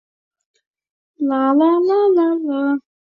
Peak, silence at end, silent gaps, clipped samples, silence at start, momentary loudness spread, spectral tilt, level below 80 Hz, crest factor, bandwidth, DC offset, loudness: -4 dBFS; 0.35 s; none; under 0.1%; 1.2 s; 8 LU; -7.5 dB/octave; -70 dBFS; 14 dB; 5.2 kHz; under 0.1%; -17 LUFS